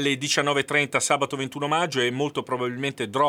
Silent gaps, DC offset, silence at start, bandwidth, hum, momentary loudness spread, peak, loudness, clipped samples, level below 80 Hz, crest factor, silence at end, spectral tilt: none; under 0.1%; 0 s; 16.5 kHz; none; 6 LU; -4 dBFS; -24 LUFS; under 0.1%; -70 dBFS; 20 dB; 0 s; -3 dB/octave